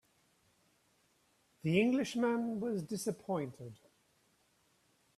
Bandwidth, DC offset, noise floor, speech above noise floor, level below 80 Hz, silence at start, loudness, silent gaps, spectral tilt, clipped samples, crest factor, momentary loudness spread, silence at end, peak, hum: 14 kHz; under 0.1%; -74 dBFS; 39 dB; -76 dBFS; 1.65 s; -35 LUFS; none; -6 dB/octave; under 0.1%; 22 dB; 13 LU; 1.45 s; -16 dBFS; none